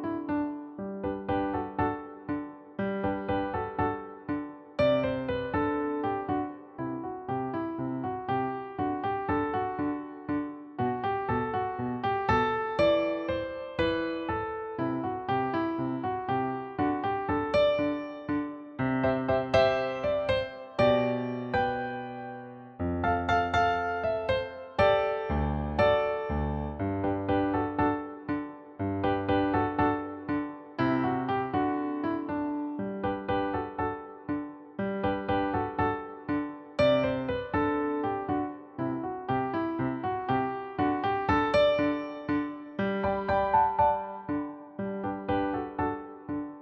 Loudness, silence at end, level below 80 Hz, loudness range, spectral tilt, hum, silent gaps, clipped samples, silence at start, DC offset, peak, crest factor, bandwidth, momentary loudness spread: -30 LUFS; 0 s; -48 dBFS; 4 LU; -8 dB/octave; none; none; under 0.1%; 0 s; under 0.1%; -10 dBFS; 20 dB; 8 kHz; 11 LU